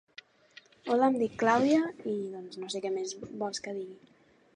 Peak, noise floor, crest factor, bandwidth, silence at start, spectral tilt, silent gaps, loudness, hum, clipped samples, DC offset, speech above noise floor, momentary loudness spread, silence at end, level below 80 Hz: -10 dBFS; -58 dBFS; 22 dB; 10.5 kHz; 0.85 s; -4.5 dB/octave; none; -30 LUFS; none; under 0.1%; under 0.1%; 28 dB; 15 LU; 0.6 s; -74 dBFS